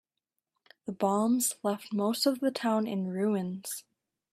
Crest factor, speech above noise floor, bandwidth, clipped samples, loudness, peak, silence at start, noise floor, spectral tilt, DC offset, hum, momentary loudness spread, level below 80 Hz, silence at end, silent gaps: 18 dB; 57 dB; 15.5 kHz; under 0.1%; -30 LUFS; -14 dBFS; 0.85 s; -87 dBFS; -4.5 dB/octave; under 0.1%; none; 12 LU; -76 dBFS; 0.5 s; none